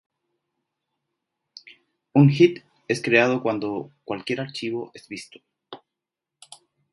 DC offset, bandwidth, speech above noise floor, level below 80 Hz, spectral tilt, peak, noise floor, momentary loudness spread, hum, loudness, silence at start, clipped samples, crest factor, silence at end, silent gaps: under 0.1%; 11.5 kHz; 64 dB; -70 dBFS; -6.5 dB/octave; -2 dBFS; -86 dBFS; 20 LU; none; -22 LUFS; 2.15 s; under 0.1%; 24 dB; 1.15 s; none